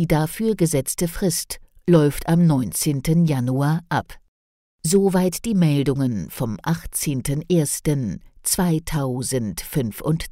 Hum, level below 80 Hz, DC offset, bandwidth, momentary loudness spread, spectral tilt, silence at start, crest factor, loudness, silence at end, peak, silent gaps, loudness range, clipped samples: none; -40 dBFS; under 0.1%; 16 kHz; 8 LU; -5.5 dB/octave; 0 s; 14 dB; -21 LUFS; 0 s; -6 dBFS; 4.28-4.79 s; 3 LU; under 0.1%